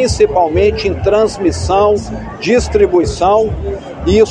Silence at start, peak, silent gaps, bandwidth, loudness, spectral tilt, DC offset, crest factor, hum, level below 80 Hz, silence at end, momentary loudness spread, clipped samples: 0 s; 0 dBFS; none; 10 kHz; -13 LUFS; -5.5 dB/octave; under 0.1%; 12 dB; none; -26 dBFS; 0 s; 9 LU; under 0.1%